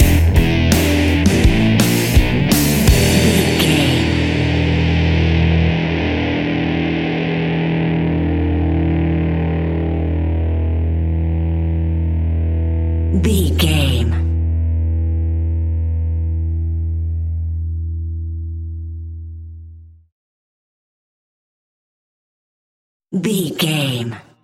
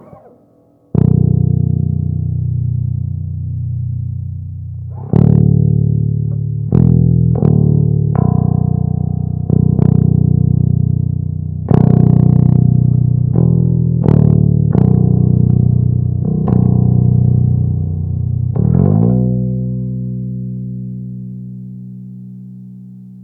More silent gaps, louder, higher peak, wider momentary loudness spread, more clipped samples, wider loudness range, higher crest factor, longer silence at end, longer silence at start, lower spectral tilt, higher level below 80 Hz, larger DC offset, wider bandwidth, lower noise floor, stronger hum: first, 20.12-23.00 s vs none; second, -17 LUFS vs -13 LUFS; about the same, 0 dBFS vs 0 dBFS; second, 10 LU vs 15 LU; second, under 0.1% vs 0.4%; first, 13 LU vs 7 LU; about the same, 16 dB vs 12 dB; first, 0.2 s vs 0 s; second, 0 s vs 0.95 s; second, -5.5 dB/octave vs -14 dB/octave; first, -22 dBFS vs -30 dBFS; neither; first, 17 kHz vs 1.9 kHz; second, -39 dBFS vs -50 dBFS; first, 50 Hz at -45 dBFS vs none